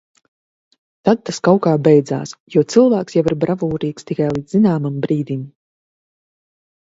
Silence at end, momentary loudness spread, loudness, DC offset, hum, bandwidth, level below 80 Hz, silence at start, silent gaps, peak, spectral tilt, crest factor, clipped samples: 1.35 s; 11 LU; -17 LUFS; under 0.1%; none; 8 kHz; -54 dBFS; 1.05 s; 2.40-2.46 s; 0 dBFS; -7 dB/octave; 18 dB; under 0.1%